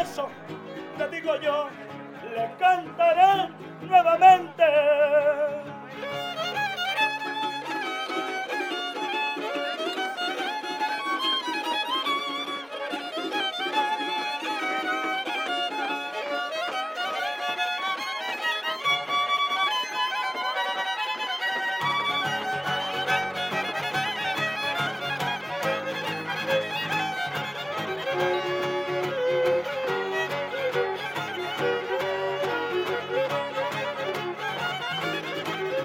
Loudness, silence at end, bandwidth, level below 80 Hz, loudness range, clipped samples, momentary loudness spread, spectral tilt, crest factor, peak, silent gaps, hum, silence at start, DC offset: -26 LUFS; 0 s; 17 kHz; -78 dBFS; 7 LU; under 0.1%; 9 LU; -3.5 dB/octave; 22 dB; -4 dBFS; none; none; 0 s; under 0.1%